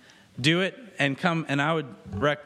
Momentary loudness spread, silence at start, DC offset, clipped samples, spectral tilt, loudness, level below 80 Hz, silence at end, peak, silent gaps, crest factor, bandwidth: 7 LU; 0.35 s; under 0.1%; under 0.1%; -5.5 dB/octave; -26 LUFS; -58 dBFS; 0 s; -6 dBFS; none; 22 dB; 12.5 kHz